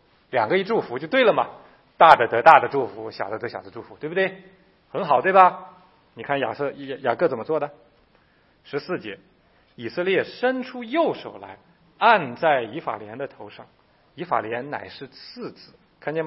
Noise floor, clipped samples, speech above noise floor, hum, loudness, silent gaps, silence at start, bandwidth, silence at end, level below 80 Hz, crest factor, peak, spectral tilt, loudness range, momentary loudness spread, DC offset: -60 dBFS; under 0.1%; 38 dB; none; -21 LUFS; none; 0.35 s; 7.8 kHz; 0 s; -68 dBFS; 24 dB; 0 dBFS; -6.5 dB/octave; 10 LU; 23 LU; under 0.1%